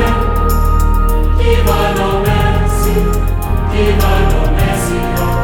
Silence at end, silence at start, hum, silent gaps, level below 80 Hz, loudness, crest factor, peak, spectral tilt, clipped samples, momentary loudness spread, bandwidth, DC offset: 0 s; 0 s; none; none; -14 dBFS; -14 LUFS; 10 dB; 0 dBFS; -6 dB/octave; under 0.1%; 4 LU; 18 kHz; under 0.1%